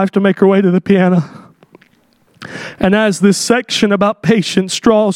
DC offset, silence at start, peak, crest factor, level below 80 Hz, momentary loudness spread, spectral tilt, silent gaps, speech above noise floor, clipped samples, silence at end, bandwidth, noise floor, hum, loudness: under 0.1%; 0 s; 0 dBFS; 14 dB; -48 dBFS; 9 LU; -5.5 dB/octave; none; 42 dB; under 0.1%; 0 s; 13.5 kHz; -54 dBFS; none; -12 LUFS